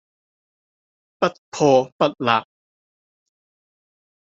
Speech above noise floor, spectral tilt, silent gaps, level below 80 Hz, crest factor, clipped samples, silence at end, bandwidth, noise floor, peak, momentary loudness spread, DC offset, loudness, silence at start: over 71 dB; -5 dB/octave; 1.38-1.52 s, 1.92-1.99 s; -68 dBFS; 22 dB; under 0.1%; 1.9 s; 7.8 kHz; under -90 dBFS; -2 dBFS; 7 LU; under 0.1%; -20 LUFS; 1.2 s